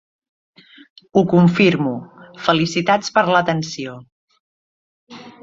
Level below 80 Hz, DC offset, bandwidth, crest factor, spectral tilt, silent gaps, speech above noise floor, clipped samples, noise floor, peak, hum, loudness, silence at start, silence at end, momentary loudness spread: -58 dBFS; under 0.1%; 7.8 kHz; 20 dB; -6 dB/octave; 4.12-4.28 s, 4.40-5.07 s; over 73 dB; under 0.1%; under -90 dBFS; 0 dBFS; none; -17 LUFS; 1.15 s; 0.15 s; 14 LU